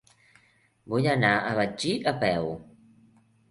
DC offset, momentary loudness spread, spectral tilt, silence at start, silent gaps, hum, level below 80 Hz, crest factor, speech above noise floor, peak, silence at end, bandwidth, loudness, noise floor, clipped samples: under 0.1%; 9 LU; -5.5 dB/octave; 0.85 s; none; none; -60 dBFS; 20 dB; 38 dB; -8 dBFS; 0.85 s; 11.5 kHz; -26 LUFS; -64 dBFS; under 0.1%